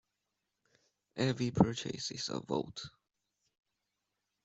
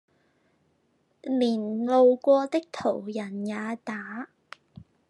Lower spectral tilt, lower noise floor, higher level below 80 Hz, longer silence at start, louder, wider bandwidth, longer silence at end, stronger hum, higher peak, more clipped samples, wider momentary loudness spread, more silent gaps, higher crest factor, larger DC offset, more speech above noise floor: about the same, -5.5 dB/octave vs -6.5 dB/octave; first, -86 dBFS vs -70 dBFS; first, -64 dBFS vs -76 dBFS; about the same, 1.15 s vs 1.25 s; second, -35 LUFS vs -26 LUFS; second, 8.2 kHz vs 11 kHz; first, 1.55 s vs 0.85 s; neither; about the same, -10 dBFS vs -10 dBFS; neither; second, 16 LU vs 19 LU; neither; first, 28 dB vs 18 dB; neither; first, 52 dB vs 44 dB